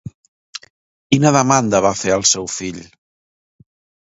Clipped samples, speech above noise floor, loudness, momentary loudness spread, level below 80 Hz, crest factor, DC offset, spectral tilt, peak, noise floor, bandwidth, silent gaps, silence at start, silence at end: under 0.1%; over 74 dB; -15 LUFS; 21 LU; -52 dBFS; 18 dB; under 0.1%; -4 dB/octave; 0 dBFS; under -90 dBFS; 8 kHz; 0.14-0.53 s, 0.70-1.10 s; 0.05 s; 1.2 s